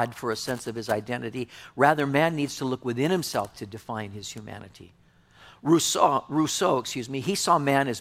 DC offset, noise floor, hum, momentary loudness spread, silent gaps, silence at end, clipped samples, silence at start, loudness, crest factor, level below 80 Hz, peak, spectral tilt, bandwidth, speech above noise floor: under 0.1%; -54 dBFS; none; 15 LU; none; 0 s; under 0.1%; 0 s; -26 LUFS; 22 dB; -64 dBFS; -4 dBFS; -4 dB/octave; 16.5 kHz; 28 dB